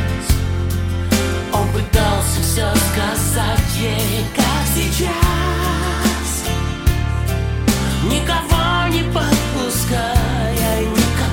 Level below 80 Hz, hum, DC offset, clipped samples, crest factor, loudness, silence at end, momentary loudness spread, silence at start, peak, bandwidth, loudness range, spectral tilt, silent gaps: -22 dBFS; none; under 0.1%; under 0.1%; 16 dB; -18 LUFS; 0 s; 4 LU; 0 s; 0 dBFS; 17 kHz; 1 LU; -4.5 dB/octave; none